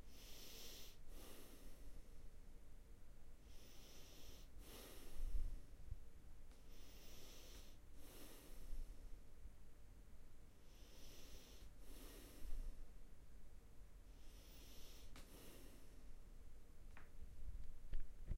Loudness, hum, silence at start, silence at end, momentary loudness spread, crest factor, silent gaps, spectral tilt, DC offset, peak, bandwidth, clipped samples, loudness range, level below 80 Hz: -62 LUFS; none; 0 s; 0 s; 10 LU; 20 dB; none; -4 dB/octave; under 0.1%; -30 dBFS; 16 kHz; under 0.1%; 5 LU; -54 dBFS